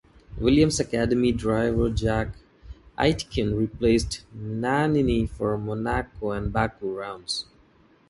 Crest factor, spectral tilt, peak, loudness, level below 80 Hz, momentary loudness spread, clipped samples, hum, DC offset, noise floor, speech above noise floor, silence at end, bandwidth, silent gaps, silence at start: 18 dB; -5.5 dB/octave; -6 dBFS; -25 LUFS; -38 dBFS; 11 LU; under 0.1%; none; under 0.1%; -58 dBFS; 34 dB; 0.65 s; 11.5 kHz; none; 0.3 s